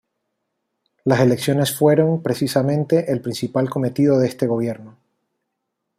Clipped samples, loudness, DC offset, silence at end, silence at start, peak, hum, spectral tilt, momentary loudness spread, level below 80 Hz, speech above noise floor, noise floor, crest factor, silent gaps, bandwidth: under 0.1%; -19 LUFS; under 0.1%; 1.1 s; 1.05 s; -2 dBFS; none; -6.5 dB/octave; 7 LU; -60 dBFS; 59 dB; -77 dBFS; 18 dB; none; 15.5 kHz